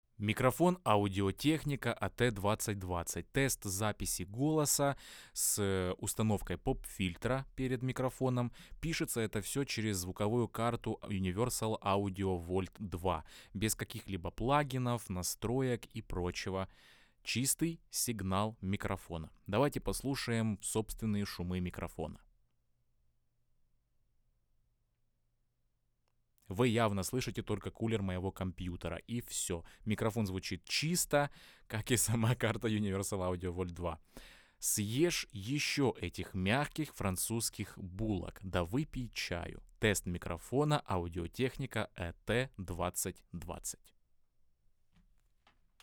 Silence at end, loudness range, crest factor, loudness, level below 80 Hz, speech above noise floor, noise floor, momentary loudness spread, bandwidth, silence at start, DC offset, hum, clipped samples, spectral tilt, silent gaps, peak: 2.05 s; 5 LU; 22 dB; -36 LUFS; -54 dBFS; 42 dB; -78 dBFS; 10 LU; over 20 kHz; 0.2 s; under 0.1%; none; under 0.1%; -4.5 dB/octave; none; -14 dBFS